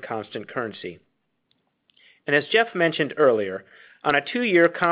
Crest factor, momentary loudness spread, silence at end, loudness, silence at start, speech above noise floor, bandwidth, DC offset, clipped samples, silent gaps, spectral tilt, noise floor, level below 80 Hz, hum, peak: 20 dB; 16 LU; 0 s; -22 LUFS; 0 s; 49 dB; 5.2 kHz; under 0.1%; under 0.1%; none; -2.5 dB/octave; -71 dBFS; -68 dBFS; none; -4 dBFS